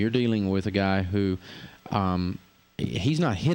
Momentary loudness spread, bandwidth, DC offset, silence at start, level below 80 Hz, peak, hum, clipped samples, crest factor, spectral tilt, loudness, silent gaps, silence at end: 16 LU; 16.5 kHz; under 0.1%; 0 s; -52 dBFS; -10 dBFS; none; under 0.1%; 16 dB; -7 dB/octave; -27 LUFS; none; 0 s